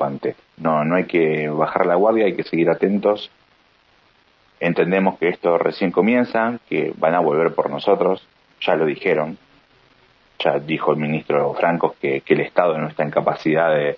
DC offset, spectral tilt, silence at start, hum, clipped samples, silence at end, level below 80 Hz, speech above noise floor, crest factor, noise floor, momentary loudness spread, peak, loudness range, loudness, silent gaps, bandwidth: under 0.1%; -8.5 dB/octave; 0 s; none; under 0.1%; 0 s; -66 dBFS; 38 dB; 18 dB; -57 dBFS; 6 LU; -2 dBFS; 3 LU; -19 LUFS; none; 6 kHz